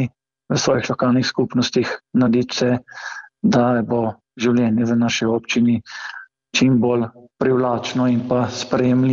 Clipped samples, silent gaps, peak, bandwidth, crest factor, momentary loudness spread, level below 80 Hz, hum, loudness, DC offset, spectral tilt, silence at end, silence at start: under 0.1%; none; -6 dBFS; 7.4 kHz; 14 dB; 10 LU; -56 dBFS; none; -19 LUFS; under 0.1%; -5.5 dB/octave; 0 s; 0 s